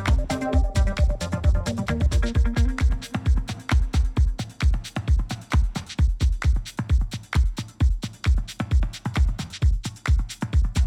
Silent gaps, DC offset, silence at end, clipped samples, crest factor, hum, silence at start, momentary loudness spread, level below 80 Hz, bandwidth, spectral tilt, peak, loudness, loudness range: none; under 0.1%; 0 s; under 0.1%; 12 dB; none; 0 s; 4 LU; -24 dBFS; 12.5 kHz; -6 dB/octave; -10 dBFS; -25 LUFS; 2 LU